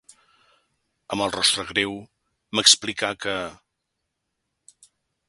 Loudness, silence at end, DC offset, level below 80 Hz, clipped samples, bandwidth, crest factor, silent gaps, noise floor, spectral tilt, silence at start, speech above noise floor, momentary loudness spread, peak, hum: -21 LUFS; 1.75 s; under 0.1%; -60 dBFS; under 0.1%; 12 kHz; 26 dB; none; -79 dBFS; -1 dB/octave; 1.1 s; 56 dB; 16 LU; 0 dBFS; none